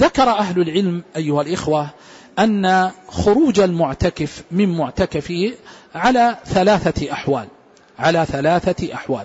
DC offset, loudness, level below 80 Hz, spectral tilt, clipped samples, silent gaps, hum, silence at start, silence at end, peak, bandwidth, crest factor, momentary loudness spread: under 0.1%; -18 LUFS; -40 dBFS; -6 dB/octave; under 0.1%; none; none; 0 s; 0 s; -4 dBFS; 8 kHz; 14 dB; 9 LU